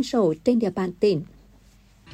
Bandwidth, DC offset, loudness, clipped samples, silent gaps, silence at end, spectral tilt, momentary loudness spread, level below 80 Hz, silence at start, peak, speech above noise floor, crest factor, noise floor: 13 kHz; under 0.1%; -23 LUFS; under 0.1%; none; 0 s; -7 dB/octave; 7 LU; -56 dBFS; 0 s; -8 dBFS; 32 dB; 16 dB; -54 dBFS